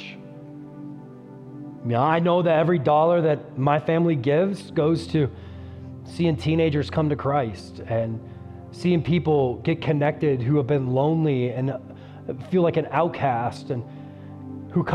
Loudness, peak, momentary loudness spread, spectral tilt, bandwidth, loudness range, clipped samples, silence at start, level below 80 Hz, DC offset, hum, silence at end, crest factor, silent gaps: -23 LUFS; -6 dBFS; 20 LU; -8.5 dB/octave; 10.5 kHz; 5 LU; under 0.1%; 0 s; -54 dBFS; under 0.1%; none; 0 s; 16 dB; none